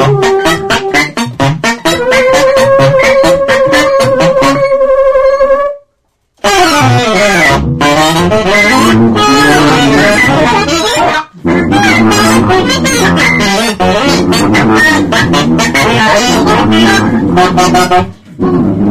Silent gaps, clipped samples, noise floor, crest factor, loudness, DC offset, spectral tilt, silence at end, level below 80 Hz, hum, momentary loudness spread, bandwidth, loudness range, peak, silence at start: none; under 0.1%; -59 dBFS; 8 dB; -7 LUFS; 2%; -4.5 dB/octave; 0 s; -30 dBFS; none; 5 LU; 16 kHz; 2 LU; 0 dBFS; 0 s